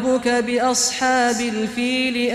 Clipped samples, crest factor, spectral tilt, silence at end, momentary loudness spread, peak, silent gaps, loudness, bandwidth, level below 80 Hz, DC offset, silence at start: under 0.1%; 12 dB; -2 dB/octave; 0 s; 4 LU; -8 dBFS; none; -19 LUFS; 14.5 kHz; -54 dBFS; under 0.1%; 0 s